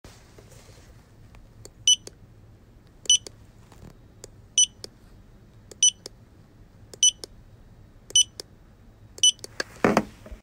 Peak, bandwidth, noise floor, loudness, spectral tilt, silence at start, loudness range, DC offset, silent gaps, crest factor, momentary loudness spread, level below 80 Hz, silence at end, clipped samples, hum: -4 dBFS; 16.5 kHz; -52 dBFS; -22 LUFS; -0.5 dB/octave; 1.85 s; 2 LU; under 0.1%; none; 24 dB; 23 LU; -54 dBFS; 0.1 s; under 0.1%; none